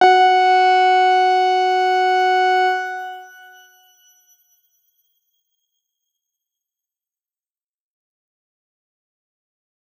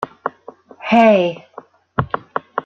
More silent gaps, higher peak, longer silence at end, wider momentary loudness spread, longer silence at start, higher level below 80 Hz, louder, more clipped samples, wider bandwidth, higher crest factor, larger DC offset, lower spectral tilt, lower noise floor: neither; about the same, -2 dBFS vs -2 dBFS; first, 6.75 s vs 0.05 s; second, 14 LU vs 17 LU; about the same, 0 s vs 0 s; second, under -90 dBFS vs -52 dBFS; about the same, -15 LUFS vs -17 LUFS; neither; first, 12.5 kHz vs 7.2 kHz; about the same, 18 dB vs 16 dB; neither; second, -1.5 dB/octave vs -7.5 dB/octave; first, under -90 dBFS vs -42 dBFS